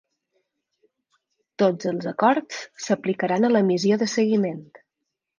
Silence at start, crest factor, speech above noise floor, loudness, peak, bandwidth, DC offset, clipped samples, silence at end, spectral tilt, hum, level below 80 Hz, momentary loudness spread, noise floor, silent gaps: 1.6 s; 18 dB; 60 dB; -22 LUFS; -6 dBFS; 9.8 kHz; under 0.1%; under 0.1%; 0.75 s; -5.5 dB/octave; none; -72 dBFS; 9 LU; -82 dBFS; none